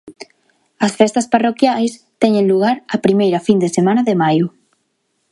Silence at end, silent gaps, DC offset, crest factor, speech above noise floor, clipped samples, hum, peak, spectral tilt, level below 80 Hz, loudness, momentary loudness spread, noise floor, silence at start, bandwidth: 0.85 s; none; under 0.1%; 16 dB; 53 dB; under 0.1%; none; 0 dBFS; -6 dB/octave; -62 dBFS; -15 LUFS; 6 LU; -67 dBFS; 0.05 s; 11.5 kHz